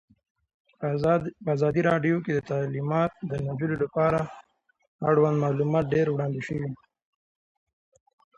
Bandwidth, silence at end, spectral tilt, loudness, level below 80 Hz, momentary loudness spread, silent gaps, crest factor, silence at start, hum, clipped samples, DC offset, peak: 7.8 kHz; 1.6 s; -8.5 dB/octave; -26 LUFS; -58 dBFS; 9 LU; 4.87-4.99 s; 18 dB; 0.8 s; none; under 0.1%; under 0.1%; -10 dBFS